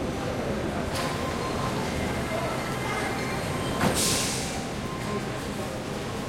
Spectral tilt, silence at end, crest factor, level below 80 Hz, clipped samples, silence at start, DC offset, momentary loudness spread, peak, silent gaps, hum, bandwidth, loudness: -4 dB/octave; 0 s; 18 dB; -44 dBFS; under 0.1%; 0 s; under 0.1%; 8 LU; -12 dBFS; none; none; 16.5 kHz; -28 LUFS